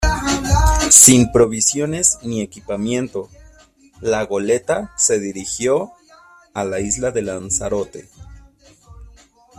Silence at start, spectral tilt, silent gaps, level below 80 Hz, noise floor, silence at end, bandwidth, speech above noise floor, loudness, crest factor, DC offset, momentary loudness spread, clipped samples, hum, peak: 0 s; -3.5 dB/octave; none; -30 dBFS; -49 dBFS; 0.5 s; 15.5 kHz; 31 dB; -15 LUFS; 18 dB; under 0.1%; 18 LU; under 0.1%; none; 0 dBFS